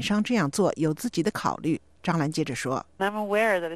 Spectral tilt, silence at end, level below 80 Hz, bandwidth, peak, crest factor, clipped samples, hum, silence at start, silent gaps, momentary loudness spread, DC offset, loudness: -5.5 dB/octave; 0 s; -58 dBFS; 13.5 kHz; -10 dBFS; 16 dB; under 0.1%; none; 0 s; none; 6 LU; 0.1%; -26 LUFS